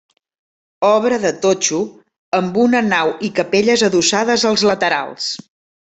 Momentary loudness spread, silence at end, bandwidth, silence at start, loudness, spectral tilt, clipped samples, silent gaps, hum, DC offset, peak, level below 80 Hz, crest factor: 9 LU; 0.45 s; 8.4 kHz; 0.8 s; -16 LUFS; -3 dB/octave; under 0.1%; 2.18-2.32 s; none; under 0.1%; -2 dBFS; -58 dBFS; 14 dB